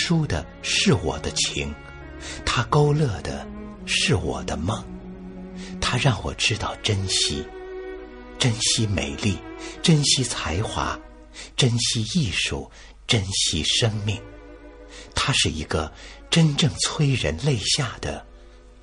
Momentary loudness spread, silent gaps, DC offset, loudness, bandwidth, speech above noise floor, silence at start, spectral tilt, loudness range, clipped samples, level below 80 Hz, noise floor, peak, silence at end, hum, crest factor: 18 LU; none; under 0.1%; -22 LUFS; 11 kHz; 23 dB; 0 s; -4 dB/octave; 2 LU; under 0.1%; -40 dBFS; -46 dBFS; -6 dBFS; 0 s; none; 18 dB